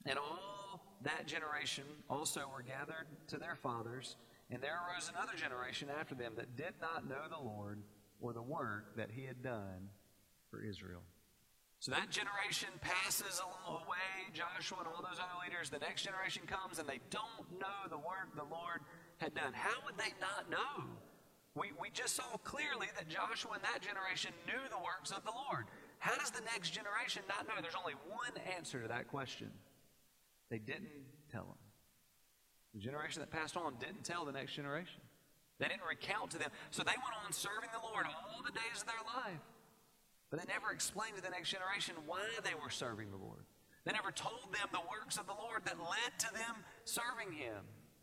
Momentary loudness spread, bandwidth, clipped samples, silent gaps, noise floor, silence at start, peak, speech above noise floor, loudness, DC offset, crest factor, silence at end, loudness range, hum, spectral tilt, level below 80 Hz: 10 LU; 16 kHz; under 0.1%; none; -73 dBFS; 0 s; -22 dBFS; 29 dB; -43 LUFS; under 0.1%; 24 dB; 0 s; 6 LU; none; -2.5 dB/octave; -78 dBFS